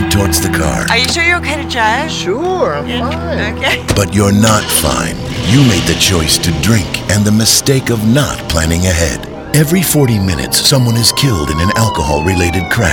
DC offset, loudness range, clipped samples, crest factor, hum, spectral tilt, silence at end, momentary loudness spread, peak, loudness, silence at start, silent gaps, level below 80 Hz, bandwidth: under 0.1%; 2 LU; under 0.1%; 12 dB; none; -4 dB/octave; 0 s; 7 LU; 0 dBFS; -11 LUFS; 0 s; none; -26 dBFS; over 20 kHz